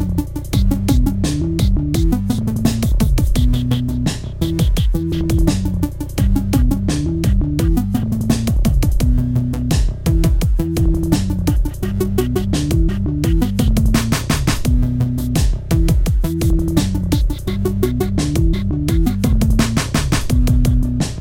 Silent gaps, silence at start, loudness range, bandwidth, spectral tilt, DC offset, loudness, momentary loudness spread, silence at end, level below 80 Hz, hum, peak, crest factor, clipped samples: none; 0 s; 1 LU; 17 kHz; -6.5 dB/octave; under 0.1%; -18 LUFS; 3 LU; 0 s; -18 dBFS; none; 0 dBFS; 14 dB; under 0.1%